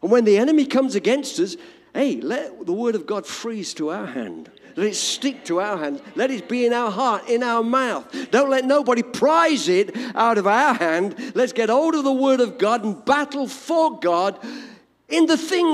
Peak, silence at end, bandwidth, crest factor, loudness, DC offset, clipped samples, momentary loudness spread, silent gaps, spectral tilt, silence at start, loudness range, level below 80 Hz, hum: -4 dBFS; 0 s; 14.5 kHz; 16 dB; -20 LUFS; under 0.1%; under 0.1%; 11 LU; none; -4 dB/octave; 0.05 s; 7 LU; -70 dBFS; none